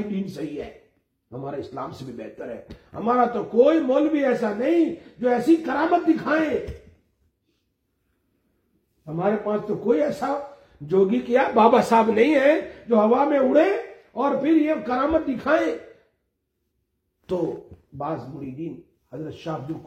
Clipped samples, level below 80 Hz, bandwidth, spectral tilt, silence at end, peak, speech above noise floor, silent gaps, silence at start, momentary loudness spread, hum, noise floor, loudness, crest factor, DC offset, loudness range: under 0.1%; -56 dBFS; 12 kHz; -7 dB/octave; 0 s; -4 dBFS; 54 dB; none; 0 s; 18 LU; none; -75 dBFS; -22 LUFS; 20 dB; under 0.1%; 12 LU